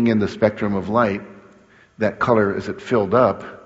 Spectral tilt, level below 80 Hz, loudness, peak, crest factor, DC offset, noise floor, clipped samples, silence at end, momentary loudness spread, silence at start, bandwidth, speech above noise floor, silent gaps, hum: -6 dB/octave; -54 dBFS; -20 LUFS; -2 dBFS; 18 dB; under 0.1%; -51 dBFS; under 0.1%; 0.1 s; 7 LU; 0 s; 8 kHz; 32 dB; none; none